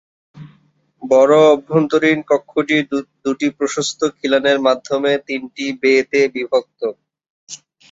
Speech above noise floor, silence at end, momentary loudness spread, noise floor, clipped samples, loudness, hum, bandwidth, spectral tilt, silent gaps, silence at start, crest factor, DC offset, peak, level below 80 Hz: 41 dB; 0.35 s; 14 LU; -56 dBFS; under 0.1%; -16 LUFS; none; 8 kHz; -4.5 dB/octave; 7.30-7.47 s; 0.35 s; 16 dB; under 0.1%; 0 dBFS; -62 dBFS